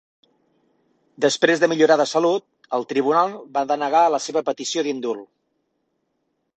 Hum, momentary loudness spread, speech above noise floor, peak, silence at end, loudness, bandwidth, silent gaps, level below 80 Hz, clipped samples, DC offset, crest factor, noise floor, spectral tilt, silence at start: none; 10 LU; 53 dB; 0 dBFS; 1.3 s; -20 LUFS; 8.8 kHz; none; -70 dBFS; under 0.1%; under 0.1%; 20 dB; -73 dBFS; -3.5 dB/octave; 1.2 s